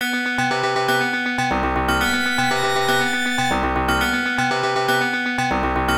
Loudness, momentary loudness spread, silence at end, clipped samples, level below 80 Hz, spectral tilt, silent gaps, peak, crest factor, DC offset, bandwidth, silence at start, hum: -19 LUFS; 2 LU; 0 s; under 0.1%; -36 dBFS; -3.5 dB/octave; none; -6 dBFS; 14 dB; under 0.1%; 16.5 kHz; 0 s; none